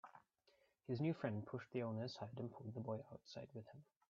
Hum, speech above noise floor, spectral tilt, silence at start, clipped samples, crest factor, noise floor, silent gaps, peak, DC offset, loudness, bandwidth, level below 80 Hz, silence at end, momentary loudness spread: none; 31 dB; -6.5 dB/octave; 0.05 s; under 0.1%; 20 dB; -78 dBFS; none; -28 dBFS; under 0.1%; -48 LUFS; 7.4 kHz; -84 dBFS; 0.25 s; 17 LU